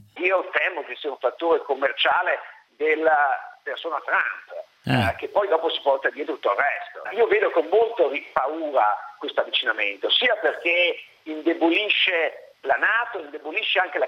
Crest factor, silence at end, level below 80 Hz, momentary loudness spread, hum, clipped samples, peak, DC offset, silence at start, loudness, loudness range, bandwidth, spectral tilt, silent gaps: 20 dB; 0 s; -66 dBFS; 11 LU; none; under 0.1%; -4 dBFS; under 0.1%; 0.15 s; -22 LUFS; 3 LU; 14 kHz; -5.5 dB/octave; none